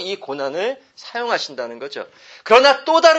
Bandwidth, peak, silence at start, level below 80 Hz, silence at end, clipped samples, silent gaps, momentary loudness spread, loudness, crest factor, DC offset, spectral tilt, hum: 8.6 kHz; 0 dBFS; 0 s; -64 dBFS; 0 s; under 0.1%; none; 21 LU; -17 LUFS; 18 dB; under 0.1%; -2 dB/octave; none